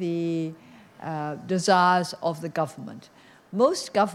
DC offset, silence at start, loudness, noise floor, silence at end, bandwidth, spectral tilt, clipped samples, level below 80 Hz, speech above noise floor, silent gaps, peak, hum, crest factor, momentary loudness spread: under 0.1%; 0 s; -25 LUFS; -49 dBFS; 0 s; 15.5 kHz; -5 dB/octave; under 0.1%; -72 dBFS; 24 dB; none; -6 dBFS; none; 20 dB; 18 LU